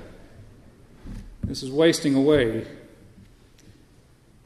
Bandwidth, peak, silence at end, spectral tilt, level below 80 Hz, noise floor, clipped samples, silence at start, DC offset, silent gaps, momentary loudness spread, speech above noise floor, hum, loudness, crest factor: 13.5 kHz; -6 dBFS; 1.65 s; -5.5 dB/octave; -46 dBFS; -55 dBFS; under 0.1%; 0 s; under 0.1%; none; 23 LU; 34 dB; none; -22 LUFS; 20 dB